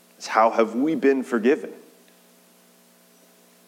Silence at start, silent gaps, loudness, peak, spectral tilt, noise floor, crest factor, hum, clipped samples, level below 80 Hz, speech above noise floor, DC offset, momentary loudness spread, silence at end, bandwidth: 0.2 s; none; -21 LUFS; -4 dBFS; -5 dB/octave; -56 dBFS; 22 dB; 60 Hz at -55 dBFS; under 0.1%; under -90 dBFS; 35 dB; under 0.1%; 6 LU; 1.95 s; 16.5 kHz